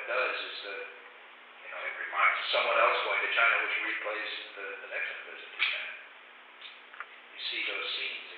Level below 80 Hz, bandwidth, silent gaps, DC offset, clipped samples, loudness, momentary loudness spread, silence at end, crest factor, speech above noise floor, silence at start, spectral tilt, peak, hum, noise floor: under -90 dBFS; 5.4 kHz; none; under 0.1%; under 0.1%; -30 LUFS; 22 LU; 0 s; 20 dB; 21 dB; 0 s; 7 dB/octave; -14 dBFS; none; -52 dBFS